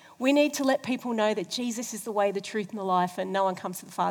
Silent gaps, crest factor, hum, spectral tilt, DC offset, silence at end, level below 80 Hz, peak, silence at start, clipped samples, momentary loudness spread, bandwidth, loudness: none; 18 dB; none; -4 dB/octave; under 0.1%; 0 s; -84 dBFS; -10 dBFS; 0.2 s; under 0.1%; 9 LU; over 20 kHz; -28 LUFS